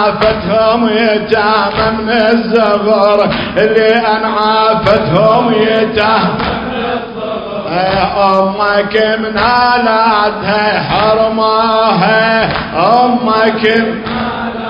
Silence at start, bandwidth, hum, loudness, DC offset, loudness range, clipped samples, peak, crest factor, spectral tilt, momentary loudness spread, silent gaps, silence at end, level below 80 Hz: 0 s; 7.2 kHz; none; -11 LUFS; under 0.1%; 3 LU; 0.2%; 0 dBFS; 10 dB; -7.5 dB/octave; 7 LU; none; 0 s; -36 dBFS